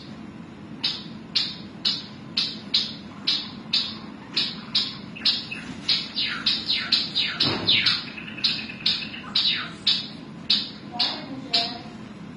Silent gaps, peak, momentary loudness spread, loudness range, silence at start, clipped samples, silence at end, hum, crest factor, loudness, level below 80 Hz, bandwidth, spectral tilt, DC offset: none; -6 dBFS; 13 LU; 4 LU; 0 s; under 0.1%; 0 s; none; 22 dB; -24 LUFS; -60 dBFS; 11 kHz; -3 dB/octave; under 0.1%